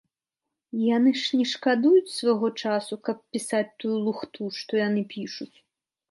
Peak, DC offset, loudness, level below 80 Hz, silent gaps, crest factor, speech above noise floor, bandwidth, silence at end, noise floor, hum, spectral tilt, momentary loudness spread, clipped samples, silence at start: -10 dBFS; under 0.1%; -25 LUFS; -78 dBFS; none; 16 dB; 62 dB; 11.5 kHz; 0.65 s; -87 dBFS; none; -5 dB/octave; 13 LU; under 0.1%; 0.75 s